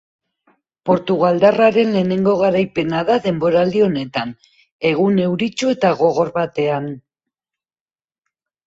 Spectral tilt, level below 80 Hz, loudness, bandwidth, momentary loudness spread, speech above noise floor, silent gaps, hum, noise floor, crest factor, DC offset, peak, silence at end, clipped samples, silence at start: -6.5 dB/octave; -56 dBFS; -17 LUFS; 7.8 kHz; 10 LU; over 74 dB; 4.72-4.79 s; none; under -90 dBFS; 16 dB; under 0.1%; 0 dBFS; 1.65 s; under 0.1%; 0.85 s